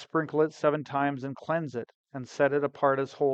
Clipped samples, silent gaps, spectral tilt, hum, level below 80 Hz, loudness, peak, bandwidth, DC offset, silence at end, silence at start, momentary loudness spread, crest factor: under 0.1%; 1.95-2.04 s; -7 dB/octave; none; -74 dBFS; -28 LUFS; -10 dBFS; 8.2 kHz; under 0.1%; 0 s; 0 s; 13 LU; 18 dB